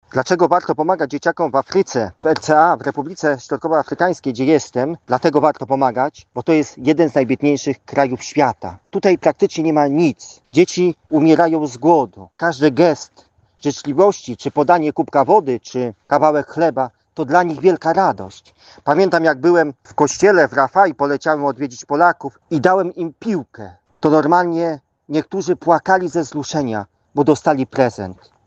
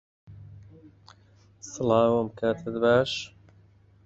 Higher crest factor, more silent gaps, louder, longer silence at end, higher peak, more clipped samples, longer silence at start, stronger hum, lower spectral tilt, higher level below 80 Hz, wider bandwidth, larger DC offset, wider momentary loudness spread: about the same, 16 dB vs 20 dB; neither; first, -17 LUFS vs -25 LUFS; second, 0.35 s vs 0.8 s; first, 0 dBFS vs -8 dBFS; neither; second, 0.15 s vs 0.3 s; neither; about the same, -6 dB/octave vs -5.5 dB/octave; about the same, -58 dBFS vs -60 dBFS; about the same, 8.2 kHz vs 8 kHz; neither; second, 10 LU vs 23 LU